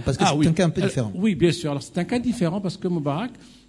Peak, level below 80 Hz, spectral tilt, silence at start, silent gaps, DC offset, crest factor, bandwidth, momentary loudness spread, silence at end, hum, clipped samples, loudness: -4 dBFS; -48 dBFS; -6 dB/octave; 0 s; none; under 0.1%; 18 dB; 12 kHz; 8 LU; 0.2 s; none; under 0.1%; -23 LUFS